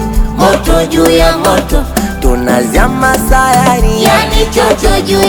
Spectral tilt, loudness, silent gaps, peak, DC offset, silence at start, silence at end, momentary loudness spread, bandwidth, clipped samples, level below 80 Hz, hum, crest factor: -4.5 dB/octave; -9 LUFS; none; 0 dBFS; under 0.1%; 0 s; 0 s; 6 LU; over 20 kHz; 1%; -14 dBFS; none; 8 dB